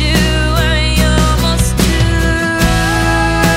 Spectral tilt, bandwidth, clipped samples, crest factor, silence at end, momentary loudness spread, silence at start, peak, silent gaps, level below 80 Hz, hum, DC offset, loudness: -4.5 dB/octave; 16.5 kHz; under 0.1%; 12 dB; 0 s; 1 LU; 0 s; 0 dBFS; none; -16 dBFS; none; under 0.1%; -12 LUFS